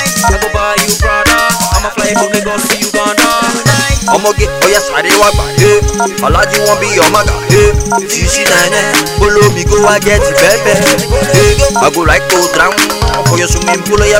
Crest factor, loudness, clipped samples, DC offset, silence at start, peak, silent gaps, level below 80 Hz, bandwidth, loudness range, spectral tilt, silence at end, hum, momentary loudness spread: 8 dB; -9 LUFS; 2%; under 0.1%; 0 s; 0 dBFS; none; -20 dBFS; over 20 kHz; 2 LU; -3.5 dB/octave; 0 s; none; 4 LU